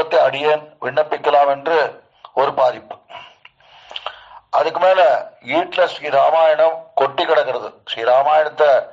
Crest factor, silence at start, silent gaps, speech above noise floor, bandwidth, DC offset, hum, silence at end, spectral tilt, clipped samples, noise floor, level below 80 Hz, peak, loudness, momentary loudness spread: 14 dB; 0 s; none; 31 dB; 7.6 kHz; under 0.1%; none; 0 s; -4.5 dB/octave; under 0.1%; -47 dBFS; -70 dBFS; -4 dBFS; -16 LUFS; 16 LU